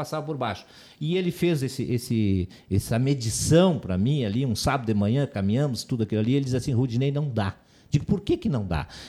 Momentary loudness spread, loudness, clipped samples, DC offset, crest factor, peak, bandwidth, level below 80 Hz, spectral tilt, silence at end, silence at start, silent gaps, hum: 6 LU; -25 LUFS; under 0.1%; under 0.1%; 18 dB; -8 dBFS; 15 kHz; -46 dBFS; -6 dB/octave; 0 s; 0 s; none; none